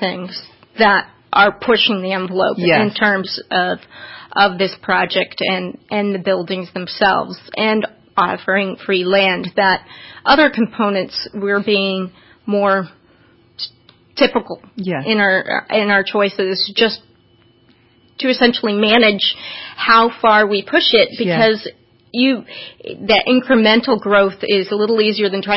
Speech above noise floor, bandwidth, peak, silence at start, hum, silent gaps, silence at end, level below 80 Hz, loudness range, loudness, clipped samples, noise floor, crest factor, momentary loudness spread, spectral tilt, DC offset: 37 dB; 5.8 kHz; 0 dBFS; 0 s; none; none; 0 s; -56 dBFS; 5 LU; -15 LUFS; under 0.1%; -52 dBFS; 16 dB; 14 LU; -8.5 dB/octave; under 0.1%